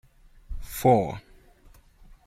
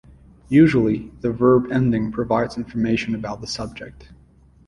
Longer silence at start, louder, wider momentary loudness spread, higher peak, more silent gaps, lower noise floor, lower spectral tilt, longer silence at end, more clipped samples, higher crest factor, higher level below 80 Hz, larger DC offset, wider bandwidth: about the same, 0.5 s vs 0.5 s; second, -24 LUFS vs -20 LUFS; first, 22 LU vs 13 LU; second, -8 dBFS vs -2 dBFS; neither; about the same, -55 dBFS vs -52 dBFS; about the same, -6.5 dB/octave vs -7 dB/octave; second, 0.15 s vs 0.65 s; neither; about the same, 20 dB vs 18 dB; about the same, -44 dBFS vs -46 dBFS; neither; first, 16 kHz vs 11 kHz